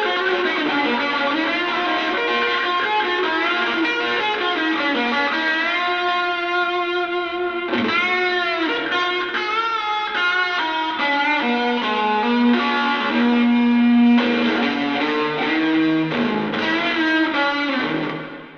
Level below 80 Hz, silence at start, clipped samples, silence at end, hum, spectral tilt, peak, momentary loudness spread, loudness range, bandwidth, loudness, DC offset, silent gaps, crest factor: -62 dBFS; 0 s; under 0.1%; 0 s; none; -4.5 dB/octave; -6 dBFS; 4 LU; 3 LU; 6.8 kHz; -19 LUFS; under 0.1%; none; 12 dB